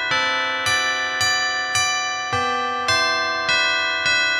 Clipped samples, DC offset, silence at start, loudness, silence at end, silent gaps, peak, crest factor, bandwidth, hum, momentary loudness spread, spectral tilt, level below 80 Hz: under 0.1%; under 0.1%; 0 s; -19 LUFS; 0 s; none; -4 dBFS; 16 dB; 15.5 kHz; none; 4 LU; -0.5 dB/octave; -56 dBFS